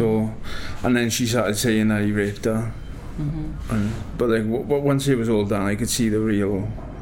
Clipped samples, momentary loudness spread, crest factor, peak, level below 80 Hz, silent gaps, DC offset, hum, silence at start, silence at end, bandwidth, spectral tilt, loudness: under 0.1%; 10 LU; 14 dB; -6 dBFS; -38 dBFS; none; under 0.1%; none; 0 s; 0 s; 17 kHz; -5.5 dB/octave; -22 LUFS